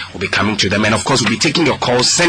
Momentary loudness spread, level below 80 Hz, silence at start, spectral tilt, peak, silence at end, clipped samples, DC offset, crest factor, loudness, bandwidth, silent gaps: 3 LU; -42 dBFS; 0 s; -3 dB/octave; -4 dBFS; 0 s; under 0.1%; 0.2%; 10 dB; -14 LUFS; 10.5 kHz; none